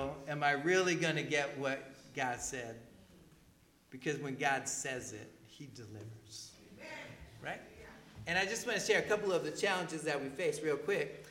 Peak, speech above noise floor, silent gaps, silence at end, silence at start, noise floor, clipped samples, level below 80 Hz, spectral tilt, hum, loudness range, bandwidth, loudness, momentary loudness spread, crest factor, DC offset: -16 dBFS; 30 dB; none; 0 s; 0 s; -66 dBFS; under 0.1%; -68 dBFS; -3.5 dB/octave; none; 8 LU; 17 kHz; -35 LUFS; 20 LU; 20 dB; under 0.1%